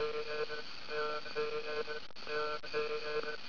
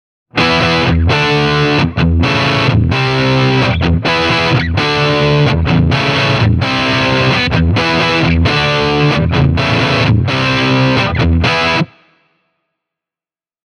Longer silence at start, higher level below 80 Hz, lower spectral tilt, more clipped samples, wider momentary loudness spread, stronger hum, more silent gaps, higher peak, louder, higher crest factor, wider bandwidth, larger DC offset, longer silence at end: second, 0 s vs 0.35 s; second, -70 dBFS vs -26 dBFS; second, 0 dB/octave vs -6 dB/octave; neither; about the same, 4 LU vs 2 LU; neither; neither; second, -26 dBFS vs 0 dBFS; second, -39 LUFS vs -12 LUFS; about the same, 12 dB vs 12 dB; second, 5.4 kHz vs 10 kHz; first, 0.8% vs under 0.1%; second, 0 s vs 1.8 s